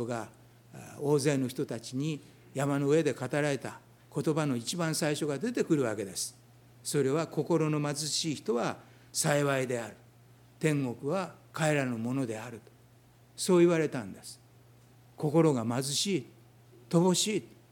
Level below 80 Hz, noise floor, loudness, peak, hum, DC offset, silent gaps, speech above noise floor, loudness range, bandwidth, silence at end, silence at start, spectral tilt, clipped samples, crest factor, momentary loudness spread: -74 dBFS; -59 dBFS; -30 LUFS; -12 dBFS; none; under 0.1%; none; 30 dB; 2 LU; 18.5 kHz; 0.25 s; 0 s; -5 dB/octave; under 0.1%; 20 dB; 14 LU